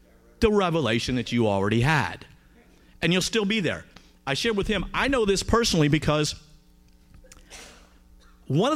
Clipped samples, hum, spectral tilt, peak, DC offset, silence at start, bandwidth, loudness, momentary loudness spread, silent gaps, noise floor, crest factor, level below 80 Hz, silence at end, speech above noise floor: under 0.1%; none; -5 dB/octave; -6 dBFS; under 0.1%; 0.4 s; 15.5 kHz; -24 LUFS; 15 LU; none; -55 dBFS; 20 dB; -42 dBFS; 0 s; 32 dB